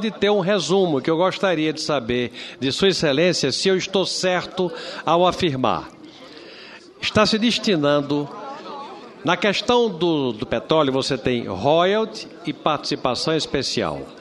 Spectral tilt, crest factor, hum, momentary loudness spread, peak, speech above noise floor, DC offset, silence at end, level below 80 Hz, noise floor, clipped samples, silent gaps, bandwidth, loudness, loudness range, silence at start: -4.5 dB/octave; 20 dB; none; 14 LU; -2 dBFS; 22 dB; under 0.1%; 0 s; -52 dBFS; -42 dBFS; under 0.1%; none; 12 kHz; -20 LUFS; 2 LU; 0 s